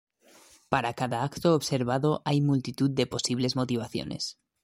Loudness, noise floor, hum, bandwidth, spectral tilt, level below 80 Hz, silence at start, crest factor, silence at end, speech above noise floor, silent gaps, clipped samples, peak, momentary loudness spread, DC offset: -28 LUFS; -57 dBFS; none; 16 kHz; -5.5 dB/octave; -60 dBFS; 0.7 s; 22 dB; 0.3 s; 30 dB; none; under 0.1%; -6 dBFS; 7 LU; under 0.1%